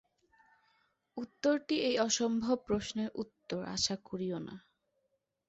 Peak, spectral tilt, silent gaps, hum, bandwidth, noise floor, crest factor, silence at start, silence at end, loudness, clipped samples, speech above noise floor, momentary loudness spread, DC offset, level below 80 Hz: -16 dBFS; -3.5 dB/octave; none; none; 8.2 kHz; -81 dBFS; 20 dB; 1.15 s; 0.9 s; -34 LUFS; under 0.1%; 47 dB; 15 LU; under 0.1%; -66 dBFS